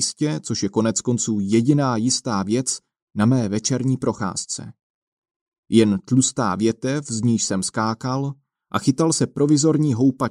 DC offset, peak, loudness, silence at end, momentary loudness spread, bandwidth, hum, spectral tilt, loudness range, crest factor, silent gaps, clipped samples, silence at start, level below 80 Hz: under 0.1%; -2 dBFS; -21 LUFS; 0 s; 8 LU; 12 kHz; none; -5 dB/octave; 2 LU; 18 dB; 3.02-3.08 s, 4.83-5.22 s, 5.36-5.52 s, 5.58-5.63 s; under 0.1%; 0 s; -60 dBFS